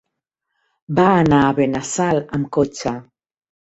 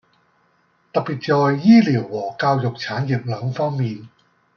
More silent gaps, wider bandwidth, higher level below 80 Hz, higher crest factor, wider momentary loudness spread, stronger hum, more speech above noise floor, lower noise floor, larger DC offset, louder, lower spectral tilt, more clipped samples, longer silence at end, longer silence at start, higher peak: neither; first, 8.2 kHz vs 6.6 kHz; first, -48 dBFS vs -64 dBFS; about the same, 18 dB vs 18 dB; about the same, 11 LU vs 13 LU; neither; first, 61 dB vs 43 dB; first, -78 dBFS vs -62 dBFS; neither; about the same, -18 LUFS vs -19 LUFS; second, -6 dB/octave vs -8 dB/octave; neither; first, 0.65 s vs 0.5 s; about the same, 0.9 s vs 0.95 s; about the same, -2 dBFS vs -2 dBFS